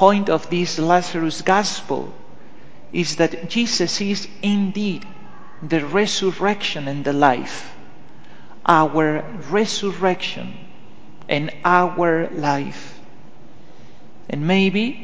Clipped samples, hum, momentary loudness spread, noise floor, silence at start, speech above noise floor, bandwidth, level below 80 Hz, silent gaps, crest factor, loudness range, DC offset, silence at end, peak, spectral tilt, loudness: under 0.1%; none; 15 LU; -46 dBFS; 0 s; 27 dB; 8 kHz; -60 dBFS; none; 20 dB; 2 LU; 3%; 0 s; 0 dBFS; -4.5 dB/octave; -20 LUFS